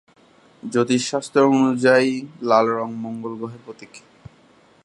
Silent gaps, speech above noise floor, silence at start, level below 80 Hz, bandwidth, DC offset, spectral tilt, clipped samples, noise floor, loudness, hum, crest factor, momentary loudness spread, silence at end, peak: none; 34 dB; 0.65 s; -66 dBFS; 11.5 kHz; under 0.1%; -5 dB/octave; under 0.1%; -54 dBFS; -19 LUFS; none; 20 dB; 20 LU; 0.85 s; -2 dBFS